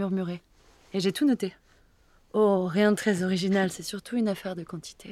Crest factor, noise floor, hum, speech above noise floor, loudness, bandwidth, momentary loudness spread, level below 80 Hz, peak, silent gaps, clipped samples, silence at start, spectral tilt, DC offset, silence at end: 18 dB; -61 dBFS; none; 34 dB; -27 LUFS; 14.5 kHz; 12 LU; -64 dBFS; -10 dBFS; none; under 0.1%; 0 s; -5.5 dB/octave; under 0.1%; 0 s